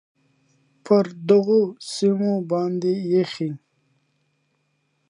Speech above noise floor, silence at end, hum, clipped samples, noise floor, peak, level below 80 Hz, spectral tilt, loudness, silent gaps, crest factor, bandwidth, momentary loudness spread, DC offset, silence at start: 50 dB; 1.55 s; none; under 0.1%; -70 dBFS; -4 dBFS; -74 dBFS; -7 dB/octave; -21 LUFS; none; 20 dB; 11.5 kHz; 9 LU; under 0.1%; 0.85 s